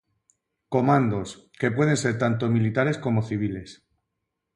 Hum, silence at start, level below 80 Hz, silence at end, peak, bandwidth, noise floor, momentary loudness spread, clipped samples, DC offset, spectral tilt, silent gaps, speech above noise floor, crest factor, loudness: none; 0.7 s; -56 dBFS; 0.8 s; -8 dBFS; 11.5 kHz; -81 dBFS; 9 LU; under 0.1%; under 0.1%; -6.5 dB/octave; none; 58 dB; 18 dB; -24 LUFS